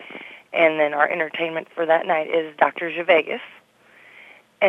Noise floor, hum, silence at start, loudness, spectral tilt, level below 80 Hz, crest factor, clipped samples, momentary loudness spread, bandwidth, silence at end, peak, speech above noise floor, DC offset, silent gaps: -52 dBFS; none; 0 s; -21 LUFS; -5.5 dB/octave; -80 dBFS; 20 dB; under 0.1%; 13 LU; 5.8 kHz; 0 s; -2 dBFS; 32 dB; under 0.1%; none